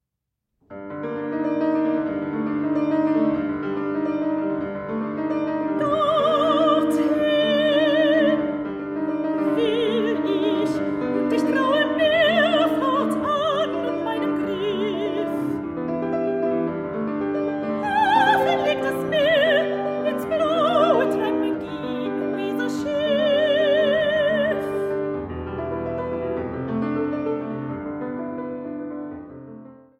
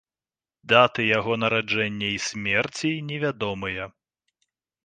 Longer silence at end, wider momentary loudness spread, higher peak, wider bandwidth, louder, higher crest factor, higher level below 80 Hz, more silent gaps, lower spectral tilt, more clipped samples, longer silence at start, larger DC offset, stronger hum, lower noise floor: second, 0.25 s vs 0.95 s; about the same, 11 LU vs 11 LU; second, -6 dBFS vs -2 dBFS; first, 14 kHz vs 9.6 kHz; about the same, -22 LUFS vs -23 LUFS; second, 16 dB vs 22 dB; about the same, -56 dBFS vs -58 dBFS; neither; first, -6 dB/octave vs -4 dB/octave; neither; about the same, 0.7 s vs 0.65 s; neither; neither; second, -81 dBFS vs under -90 dBFS